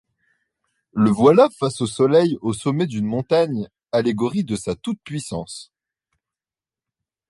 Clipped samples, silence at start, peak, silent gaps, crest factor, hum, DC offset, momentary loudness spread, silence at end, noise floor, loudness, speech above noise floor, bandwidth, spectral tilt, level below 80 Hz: under 0.1%; 0.95 s; -2 dBFS; none; 18 dB; none; under 0.1%; 15 LU; 1.65 s; under -90 dBFS; -20 LUFS; over 71 dB; 11.5 kHz; -6.5 dB/octave; -56 dBFS